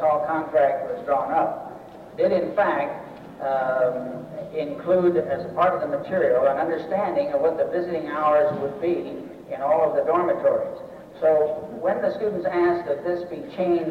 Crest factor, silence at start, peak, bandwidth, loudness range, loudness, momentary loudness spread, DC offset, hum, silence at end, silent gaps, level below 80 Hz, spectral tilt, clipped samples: 14 dB; 0 s; -10 dBFS; 6.2 kHz; 2 LU; -23 LUFS; 13 LU; under 0.1%; none; 0 s; none; -62 dBFS; -8 dB/octave; under 0.1%